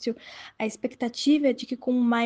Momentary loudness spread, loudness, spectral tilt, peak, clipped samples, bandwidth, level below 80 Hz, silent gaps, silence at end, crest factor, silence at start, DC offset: 12 LU; -26 LUFS; -4 dB/octave; -12 dBFS; under 0.1%; 9.4 kHz; -70 dBFS; none; 0 s; 14 dB; 0 s; under 0.1%